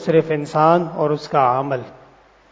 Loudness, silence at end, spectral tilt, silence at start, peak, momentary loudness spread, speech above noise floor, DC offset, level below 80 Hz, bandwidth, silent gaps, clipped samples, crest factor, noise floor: -18 LUFS; 0.6 s; -7.5 dB/octave; 0 s; -2 dBFS; 7 LU; 32 dB; under 0.1%; -60 dBFS; 8 kHz; none; under 0.1%; 18 dB; -49 dBFS